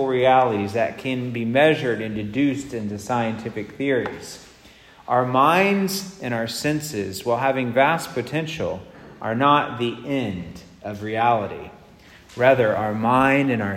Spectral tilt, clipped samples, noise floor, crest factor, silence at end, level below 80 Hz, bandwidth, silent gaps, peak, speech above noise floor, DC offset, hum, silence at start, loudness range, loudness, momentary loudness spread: -5.5 dB/octave; under 0.1%; -49 dBFS; 20 dB; 0 s; -56 dBFS; 16 kHz; none; -2 dBFS; 27 dB; under 0.1%; none; 0 s; 3 LU; -21 LUFS; 15 LU